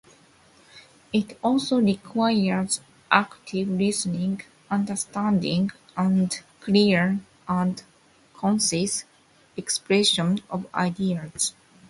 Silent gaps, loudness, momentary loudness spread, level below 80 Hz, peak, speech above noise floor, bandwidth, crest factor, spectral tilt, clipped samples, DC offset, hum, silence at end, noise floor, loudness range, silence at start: none; -24 LUFS; 9 LU; -62 dBFS; -2 dBFS; 32 dB; 11.5 kHz; 24 dB; -4.5 dB/octave; under 0.1%; under 0.1%; none; 0.4 s; -56 dBFS; 2 LU; 0.75 s